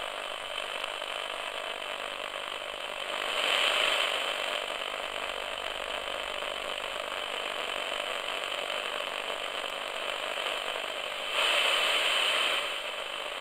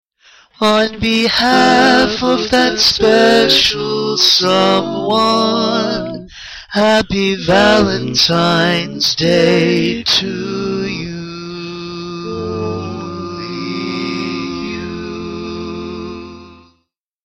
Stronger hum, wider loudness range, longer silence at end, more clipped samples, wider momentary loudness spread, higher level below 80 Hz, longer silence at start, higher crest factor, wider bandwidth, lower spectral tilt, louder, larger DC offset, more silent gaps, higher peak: neither; second, 6 LU vs 12 LU; second, 0 s vs 0.7 s; neither; second, 10 LU vs 16 LU; second, -64 dBFS vs -42 dBFS; second, 0 s vs 0.6 s; first, 24 dB vs 14 dB; about the same, 16.5 kHz vs 16.5 kHz; second, 0.5 dB/octave vs -4 dB/octave; second, -30 LUFS vs -13 LUFS; neither; neither; second, -10 dBFS vs 0 dBFS